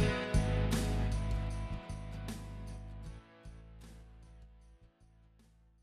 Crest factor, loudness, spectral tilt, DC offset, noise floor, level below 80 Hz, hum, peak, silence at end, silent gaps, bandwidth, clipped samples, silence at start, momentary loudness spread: 20 dB; -37 LUFS; -6 dB/octave; under 0.1%; -65 dBFS; -42 dBFS; none; -18 dBFS; 0.95 s; none; 14 kHz; under 0.1%; 0 s; 23 LU